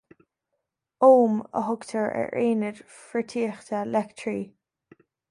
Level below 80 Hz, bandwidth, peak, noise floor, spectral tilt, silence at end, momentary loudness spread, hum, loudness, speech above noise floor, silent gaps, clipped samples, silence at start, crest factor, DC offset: -72 dBFS; 11 kHz; -6 dBFS; -81 dBFS; -6.5 dB/octave; 0.85 s; 15 LU; none; -25 LUFS; 57 dB; none; under 0.1%; 1 s; 20 dB; under 0.1%